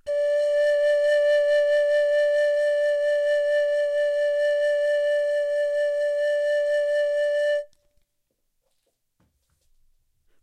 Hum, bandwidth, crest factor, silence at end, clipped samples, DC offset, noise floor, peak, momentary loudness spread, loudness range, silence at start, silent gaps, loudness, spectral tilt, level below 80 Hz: none; 10 kHz; 10 dB; 2.8 s; under 0.1%; under 0.1%; -74 dBFS; -12 dBFS; 4 LU; 7 LU; 0.05 s; none; -22 LUFS; 1 dB/octave; -68 dBFS